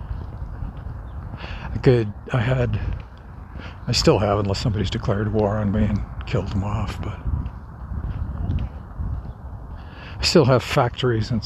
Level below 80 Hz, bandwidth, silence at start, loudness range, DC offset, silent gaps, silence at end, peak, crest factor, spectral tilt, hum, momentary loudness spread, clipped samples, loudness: -34 dBFS; 14 kHz; 0 s; 7 LU; under 0.1%; none; 0 s; -2 dBFS; 20 dB; -6 dB/octave; none; 19 LU; under 0.1%; -23 LUFS